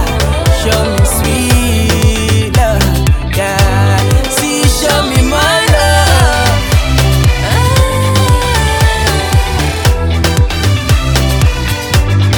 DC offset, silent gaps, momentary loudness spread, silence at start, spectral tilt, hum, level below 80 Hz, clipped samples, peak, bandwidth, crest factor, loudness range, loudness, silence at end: under 0.1%; none; 4 LU; 0 s; -4.5 dB/octave; none; -16 dBFS; under 0.1%; 0 dBFS; 19.5 kHz; 10 dB; 2 LU; -11 LUFS; 0 s